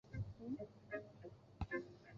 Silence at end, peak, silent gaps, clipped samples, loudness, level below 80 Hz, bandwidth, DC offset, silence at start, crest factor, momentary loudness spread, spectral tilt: 0 s; -32 dBFS; none; under 0.1%; -50 LUFS; -60 dBFS; 7.4 kHz; under 0.1%; 0.05 s; 18 dB; 12 LU; -7 dB/octave